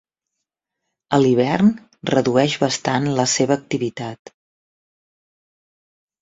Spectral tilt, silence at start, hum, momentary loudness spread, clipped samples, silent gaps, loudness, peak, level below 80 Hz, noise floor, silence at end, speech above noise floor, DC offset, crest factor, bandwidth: -5 dB/octave; 1.1 s; none; 10 LU; under 0.1%; none; -19 LUFS; -2 dBFS; -58 dBFS; -81 dBFS; 2.05 s; 63 dB; under 0.1%; 20 dB; 8 kHz